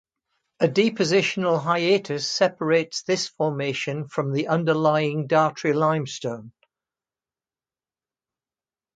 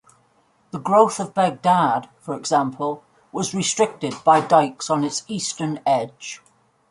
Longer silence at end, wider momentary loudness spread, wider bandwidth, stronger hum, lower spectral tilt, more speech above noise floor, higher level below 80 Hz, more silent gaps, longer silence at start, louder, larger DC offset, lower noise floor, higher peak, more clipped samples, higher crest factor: first, 2.45 s vs 0.55 s; second, 7 LU vs 15 LU; second, 9.4 kHz vs 11.5 kHz; neither; about the same, -5 dB/octave vs -4 dB/octave; first, over 68 dB vs 41 dB; about the same, -70 dBFS vs -68 dBFS; neither; second, 0.6 s vs 0.75 s; second, -23 LUFS vs -20 LUFS; neither; first, under -90 dBFS vs -61 dBFS; second, -6 dBFS vs -2 dBFS; neither; about the same, 18 dB vs 20 dB